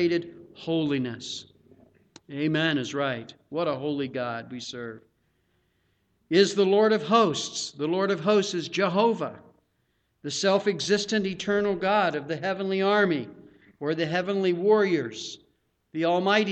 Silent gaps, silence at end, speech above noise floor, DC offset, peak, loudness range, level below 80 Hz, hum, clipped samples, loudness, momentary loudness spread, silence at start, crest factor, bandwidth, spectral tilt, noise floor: none; 0 s; 47 dB; under 0.1%; -8 dBFS; 6 LU; -68 dBFS; none; under 0.1%; -25 LUFS; 15 LU; 0 s; 20 dB; 8.8 kHz; -4.5 dB/octave; -72 dBFS